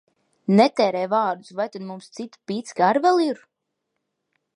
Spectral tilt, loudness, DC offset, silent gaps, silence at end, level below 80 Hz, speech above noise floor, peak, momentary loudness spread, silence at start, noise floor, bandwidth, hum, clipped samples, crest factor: -6 dB/octave; -21 LUFS; under 0.1%; none; 1.2 s; -78 dBFS; 57 dB; -2 dBFS; 18 LU; 0.5 s; -79 dBFS; 11 kHz; none; under 0.1%; 20 dB